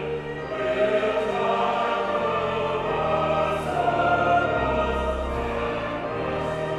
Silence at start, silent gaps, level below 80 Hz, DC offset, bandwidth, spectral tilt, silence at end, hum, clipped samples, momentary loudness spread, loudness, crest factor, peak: 0 s; none; -40 dBFS; under 0.1%; 12 kHz; -6 dB/octave; 0 s; none; under 0.1%; 7 LU; -24 LUFS; 14 dB; -10 dBFS